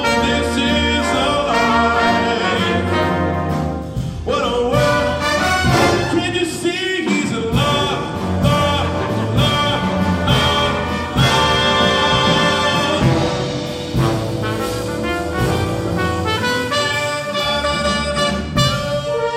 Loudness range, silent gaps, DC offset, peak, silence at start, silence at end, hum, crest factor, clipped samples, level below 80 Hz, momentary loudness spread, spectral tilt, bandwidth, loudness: 4 LU; none; under 0.1%; -2 dBFS; 0 s; 0 s; none; 16 dB; under 0.1%; -32 dBFS; 7 LU; -5 dB/octave; 16 kHz; -17 LUFS